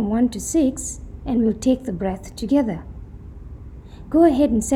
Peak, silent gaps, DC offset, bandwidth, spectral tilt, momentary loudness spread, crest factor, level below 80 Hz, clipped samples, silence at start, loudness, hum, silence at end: -4 dBFS; none; under 0.1%; 15.5 kHz; -6 dB/octave; 23 LU; 16 dB; -38 dBFS; under 0.1%; 0 s; -21 LUFS; none; 0 s